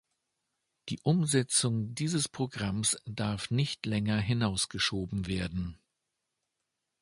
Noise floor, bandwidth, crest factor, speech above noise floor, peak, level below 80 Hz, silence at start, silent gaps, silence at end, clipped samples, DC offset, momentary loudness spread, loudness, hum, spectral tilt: -85 dBFS; 11.5 kHz; 20 dB; 54 dB; -12 dBFS; -54 dBFS; 0.85 s; none; 1.25 s; under 0.1%; under 0.1%; 8 LU; -31 LUFS; none; -4 dB/octave